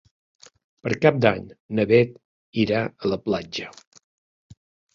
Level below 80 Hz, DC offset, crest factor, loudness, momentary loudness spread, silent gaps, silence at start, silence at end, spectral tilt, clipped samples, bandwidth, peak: -56 dBFS; under 0.1%; 24 dB; -23 LUFS; 14 LU; 1.60-1.69 s, 2.25-2.53 s; 0.85 s; 1.25 s; -7 dB/octave; under 0.1%; 7.4 kHz; -2 dBFS